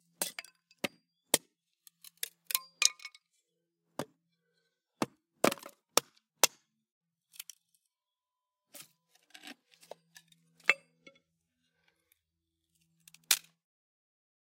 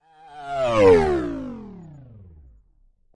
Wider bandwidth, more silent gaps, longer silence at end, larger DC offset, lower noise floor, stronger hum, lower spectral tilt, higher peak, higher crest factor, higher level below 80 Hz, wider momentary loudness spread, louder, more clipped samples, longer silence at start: first, 17 kHz vs 10.5 kHz; first, 6.92-7.01 s vs none; about the same, 1.2 s vs 1.15 s; neither; first, under -90 dBFS vs -59 dBFS; neither; second, -0.5 dB/octave vs -6.5 dB/octave; about the same, -2 dBFS vs -4 dBFS; first, 38 dB vs 18 dB; second, -84 dBFS vs -44 dBFS; about the same, 23 LU vs 24 LU; second, -33 LUFS vs -19 LUFS; neither; about the same, 0.2 s vs 0.3 s